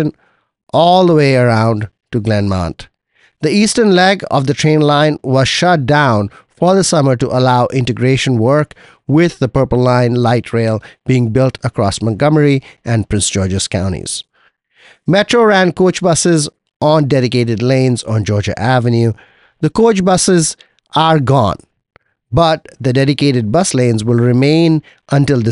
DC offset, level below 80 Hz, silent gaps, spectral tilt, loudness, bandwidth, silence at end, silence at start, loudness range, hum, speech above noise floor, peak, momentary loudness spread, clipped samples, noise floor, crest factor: under 0.1%; -40 dBFS; 16.76-16.80 s; -5.5 dB/octave; -13 LUFS; 11.5 kHz; 0 s; 0 s; 2 LU; none; 45 dB; 0 dBFS; 8 LU; under 0.1%; -57 dBFS; 12 dB